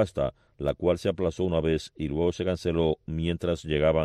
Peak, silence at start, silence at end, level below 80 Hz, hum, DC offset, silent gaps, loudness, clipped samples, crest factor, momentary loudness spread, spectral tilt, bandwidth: -12 dBFS; 0 s; 0 s; -42 dBFS; none; under 0.1%; none; -28 LUFS; under 0.1%; 14 dB; 6 LU; -7 dB/octave; 11.5 kHz